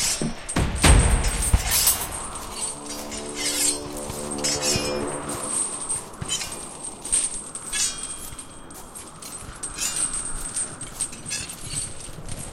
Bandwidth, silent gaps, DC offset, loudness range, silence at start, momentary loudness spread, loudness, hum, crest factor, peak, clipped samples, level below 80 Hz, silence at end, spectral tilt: 16 kHz; none; under 0.1%; 6 LU; 0 s; 17 LU; -24 LUFS; none; 24 dB; -2 dBFS; under 0.1%; -32 dBFS; 0 s; -2.5 dB/octave